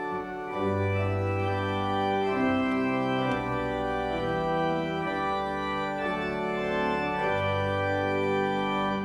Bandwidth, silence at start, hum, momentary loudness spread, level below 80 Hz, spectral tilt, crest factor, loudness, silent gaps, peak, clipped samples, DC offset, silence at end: 11 kHz; 0 s; none; 3 LU; -52 dBFS; -7 dB/octave; 12 dB; -28 LUFS; none; -16 dBFS; under 0.1%; under 0.1%; 0 s